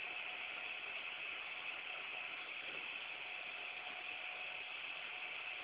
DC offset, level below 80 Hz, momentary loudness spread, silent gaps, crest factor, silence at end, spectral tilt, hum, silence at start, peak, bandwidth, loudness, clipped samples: under 0.1%; -86 dBFS; 1 LU; none; 14 dB; 0 s; 3 dB/octave; none; 0 s; -34 dBFS; 4 kHz; -44 LUFS; under 0.1%